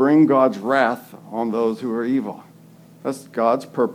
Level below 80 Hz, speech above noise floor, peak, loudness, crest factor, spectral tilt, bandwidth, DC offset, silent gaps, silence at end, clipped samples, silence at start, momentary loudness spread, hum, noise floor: -78 dBFS; 28 dB; -2 dBFS; -20 LUFS; 18 dB; -7 dB/octave; 15.5 kHz; under 0.1%; none; 0 s; under 0.1%; 0 s; 16 LU; none; -47 dBFS